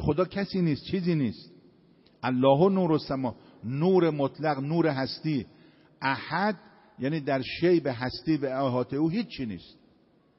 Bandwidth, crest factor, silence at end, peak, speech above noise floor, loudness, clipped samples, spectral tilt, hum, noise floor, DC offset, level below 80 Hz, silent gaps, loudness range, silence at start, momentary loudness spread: 5.8 kHz; 18 dB; 0.75 s; -8 dBFS; 36 dB; -27 LUFS; under 0.1%; -6 dB/octave; none; -63 dBFS; under 0.1%; -56 dBFS; none; 4 LU; 0 s; 12 LU